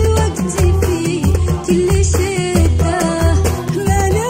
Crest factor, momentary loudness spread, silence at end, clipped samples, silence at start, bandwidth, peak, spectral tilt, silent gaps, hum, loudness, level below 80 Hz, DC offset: 12 dB; 3 LU; 0 s; under 0.1%; 0 s; 16.5 kHz; -2 dBFS; -6 dB/octave; none; none; -15 LUFS; -22 dBFS; under 0.1%